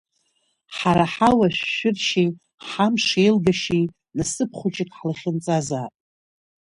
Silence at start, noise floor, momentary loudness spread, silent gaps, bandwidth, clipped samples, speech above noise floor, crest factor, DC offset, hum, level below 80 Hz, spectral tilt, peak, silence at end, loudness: 0.7 s; -69 dBFS; 11 LU; 2.54-2.58 s; 11.5 kHz; under 0.1%; 49 dB; 18 dB; under 0.1%; none; -52 dBFS; -5 dB/octave; -4 dBFS; 0.8 s; -21 LUFS